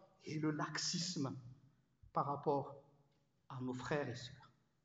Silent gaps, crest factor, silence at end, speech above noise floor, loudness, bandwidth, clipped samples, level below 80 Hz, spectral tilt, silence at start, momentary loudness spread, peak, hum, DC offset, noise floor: none; 20 dB; 0.4 s; 36 dB; -42 LUFS; 9 kHz; under 0.1%; -76 dBFS; -4.5 dB/octave; 0 s; 15 LU; -24 dBFS; none; under 0.1%; -77 dBFS